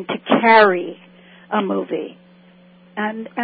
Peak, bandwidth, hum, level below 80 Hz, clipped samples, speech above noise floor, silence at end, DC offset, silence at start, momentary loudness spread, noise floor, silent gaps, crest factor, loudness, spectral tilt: 0 dBFS; 5 kHz; none; -70 dBFS; under 0.1%; 31 dB; 0 s; under 0.1%; 0 s; 20 LU; -48 dBFS; none; 20 dB; -17 LUFS; -10 dB/octave